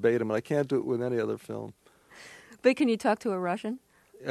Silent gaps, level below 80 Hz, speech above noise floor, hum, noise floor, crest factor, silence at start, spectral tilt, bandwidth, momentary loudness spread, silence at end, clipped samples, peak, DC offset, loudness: none; -72 dBFS; 24 dB; none; -52 dBFS; 20 dB; 0 s; -6.5 dB/octave; 13.5 kHz; 21 LU; 0 s; under 0.1%; -10 dBFS; under 0.1%; -29 LUFS